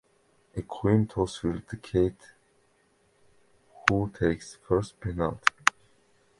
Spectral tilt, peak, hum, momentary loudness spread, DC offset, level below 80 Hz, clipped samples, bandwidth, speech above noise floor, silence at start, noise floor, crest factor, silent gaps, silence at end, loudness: -5.5 dB/octave; 0 dBFS; none; 11 LU; under 0.1%; -48 dBFS; under 0.1%; 11.5 kHz; 39 dB; 0.55 s; -67 dBFS; 30 dB; none; 0.7 s; -28 LUFS